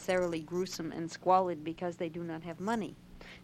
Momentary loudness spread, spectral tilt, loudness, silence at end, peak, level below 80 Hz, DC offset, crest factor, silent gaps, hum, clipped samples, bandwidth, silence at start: 12 LU; -5.5 dB/octave; -34 LUFS; 0 s; -14 dBFS; -62 dBFS; under 0.1%; 20 dB; none; none; under 0.1%; 15.5 kHz; 0 s